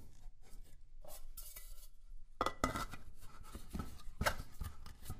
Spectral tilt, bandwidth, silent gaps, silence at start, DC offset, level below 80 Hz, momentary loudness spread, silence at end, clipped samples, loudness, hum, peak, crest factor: -4 dB/octave; 15.5 kHz; none; 0 s; under 0.1%; -50 dBFS; 23 LU; 0 s; under 0.1%; -44 LUFS; none; -16 dBFS; 26 dB